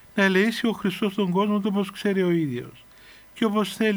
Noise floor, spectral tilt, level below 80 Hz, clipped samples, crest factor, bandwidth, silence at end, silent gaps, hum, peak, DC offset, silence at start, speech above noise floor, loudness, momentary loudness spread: -49 dBFS; -6 dB/octave; -62 dBFS; under 0.1%; 14 dB; over 20 kHz; 0 s; none; none; -8 dBFS; under 0.1%; 0.15 s; 26 dB; -24 LUFS; 9 LU